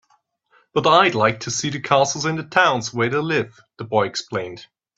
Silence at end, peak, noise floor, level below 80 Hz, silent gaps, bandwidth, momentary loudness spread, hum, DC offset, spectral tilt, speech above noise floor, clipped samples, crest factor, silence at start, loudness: 0.35 s; 0 dBFS; -63 dBFS; -60 dBFS; none; 8.2 kHz; 13 LU; none; under 0.1%; -3.5 dB/octave; 44 dB; under 0.1%; 20 dB; 0.75 s; -19 LUFS